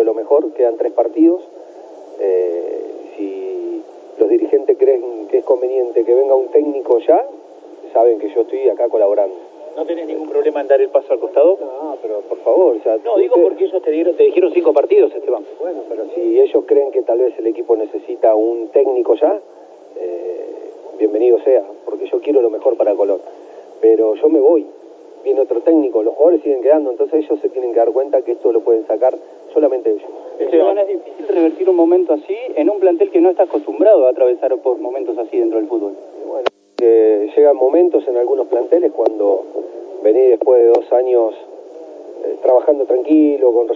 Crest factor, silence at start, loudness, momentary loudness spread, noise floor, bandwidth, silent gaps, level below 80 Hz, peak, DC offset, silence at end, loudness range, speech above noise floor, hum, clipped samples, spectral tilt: 14 dB; 0 s; -15 LUFS; 13 LU; -36 dBFS; 5.2 kHz; none; -88 dBFS; 0 dBFS; under 0.1%; 0 s; 3 LU; 22 dB; none; under 0.1%; -6 dB/octave